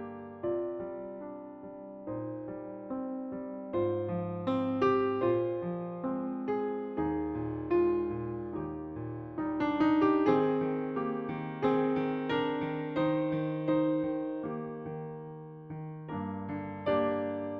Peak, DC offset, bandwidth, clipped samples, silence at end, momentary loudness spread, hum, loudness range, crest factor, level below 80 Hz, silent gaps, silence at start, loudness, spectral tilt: -14 dBFS; under 0.1%; 6 kHz; under 0.1%; 0 s; 14 LU; none; 7 LU; 18 dB; -60 dBFS; none; 0 s; -33 LUFS; -9 dB/octave